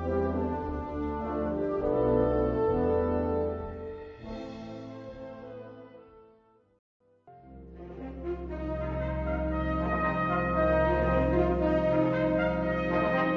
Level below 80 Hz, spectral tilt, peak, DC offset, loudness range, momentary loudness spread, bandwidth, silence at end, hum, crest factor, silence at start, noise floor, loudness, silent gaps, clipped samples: -40 dBFS; -9.5 dB/octave; -14 dBFS; under 0.1%; 18 LU; 17 LU; 6.4 kHz; 0 s; none; 16 dB; 0 s; -62 dBFS; -29 LUFS; 6.79-7.00 s; under 0.1%